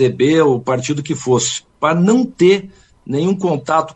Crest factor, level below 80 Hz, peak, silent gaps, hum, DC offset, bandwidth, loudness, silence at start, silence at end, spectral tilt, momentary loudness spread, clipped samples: 14 dB; -54 dBFS; -2 dBFS; none; none; under 0.1%; 8.8 kHz; -15 LUFS; 0 s; 0.05 s; -5.5 dB/octave; 7 LU; under 0.1%